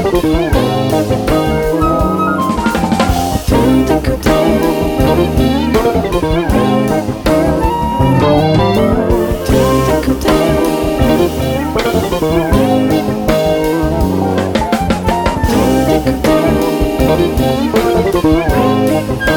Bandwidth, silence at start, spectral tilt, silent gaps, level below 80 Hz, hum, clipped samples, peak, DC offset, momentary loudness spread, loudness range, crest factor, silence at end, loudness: 19 kHz; 0 s; -6.5 dB/octave; none; -22 dBFS; none; under 0.1%; 0 dBFS; under 0.1%; 3 LU; 1 LU; 12 dB; 0 s; -12 LUFS